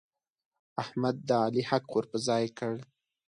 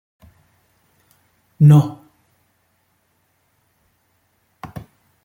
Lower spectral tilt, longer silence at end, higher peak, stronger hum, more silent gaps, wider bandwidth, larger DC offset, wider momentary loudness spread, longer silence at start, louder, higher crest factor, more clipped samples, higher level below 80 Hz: second, -5.5 dB/octave vs -9 dB/octave; second, 0.5 s vs 3.35 s; second, -12 dBFS vs -2 dBFS; neither; neither; first, 11 kHz vs 9.6 kHz; neither; second, 10 LU vs 27 LU; second, 0.75 s vs 1.6 s; second, -31 LUFS vs -14 LUFS; about the same, 20 dB vs 20 dB; neither; second, -74 dBFS vs -58 dBFS